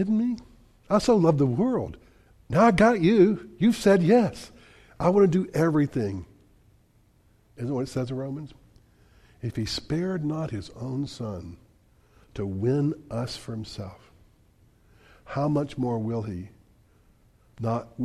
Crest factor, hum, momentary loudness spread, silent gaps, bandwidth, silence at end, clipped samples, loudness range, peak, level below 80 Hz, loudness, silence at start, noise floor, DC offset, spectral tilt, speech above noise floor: 18 dB; none; 18 LU; none; 13.5 kHz; 0 s; under 0.1%; 11 LU; -8 dBFS; -52 dBFS; -25 LUFS; 0 s; -61 dBFS; under 0.1%; -7 dB/octave; 37 dB